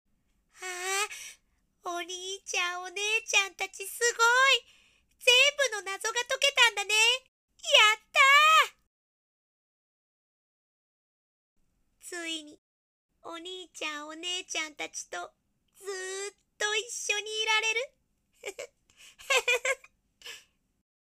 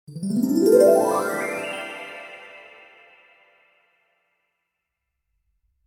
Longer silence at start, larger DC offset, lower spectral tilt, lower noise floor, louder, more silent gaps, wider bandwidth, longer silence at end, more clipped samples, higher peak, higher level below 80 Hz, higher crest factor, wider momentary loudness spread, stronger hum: first, 0.6 s vs 0.1 s; neither; second, 2.5 dB/octave vs -5.5 dB/octave; second, -70 dBFS vs -80 dBFS; second, -25 LUFS vs -20 LUFS; first, 7.28-7.48 s, 8.87-11.56 s, 12.58-13.09 s vs none; second, 15.5 kHz vs 18.5 kHz; second, 0.7 s vs 3.25 s; neither; about the same, -6 dBFS vs -4 dBFS; about the same, -76 dBFS vs -72 dBFS; about the same, 24 dB vs 20 dB; about the same, 22 LU vs 24 LU; neither